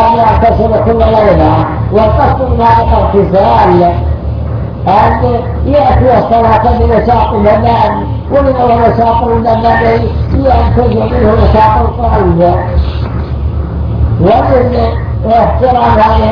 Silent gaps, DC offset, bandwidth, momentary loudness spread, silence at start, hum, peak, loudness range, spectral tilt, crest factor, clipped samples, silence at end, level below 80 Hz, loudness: none; under 0.1%; 5.4 kHz; 8 LU; 0 s; none; 0 dBFS; 2 LU; -9.5 dB/octave; 8 dB; 1%; 0 s; -16 dBFS; -9 LUFS